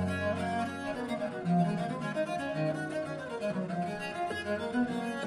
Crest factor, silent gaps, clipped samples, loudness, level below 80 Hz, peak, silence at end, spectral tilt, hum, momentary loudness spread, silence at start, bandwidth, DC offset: 16 dB; none; under 0.1%; -33 LUFS; -66 dBFS; -16 dBFS; 0 s; -6.5 dB/octave; none; 6 LU; 0 s; 12 kHz; under 0.1%